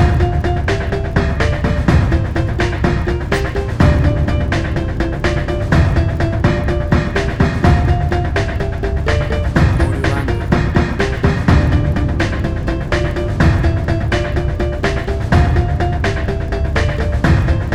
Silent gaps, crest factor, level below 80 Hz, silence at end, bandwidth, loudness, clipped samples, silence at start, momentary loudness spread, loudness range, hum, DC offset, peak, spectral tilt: none; 14 dB; -20 dBFS; 0 s; 10.5 kHz; -16 LUFS; under 0.1%; 0 s; 5 LU; 1 LU; none; under 0.1%; 0 dBFS; -7 dB/octave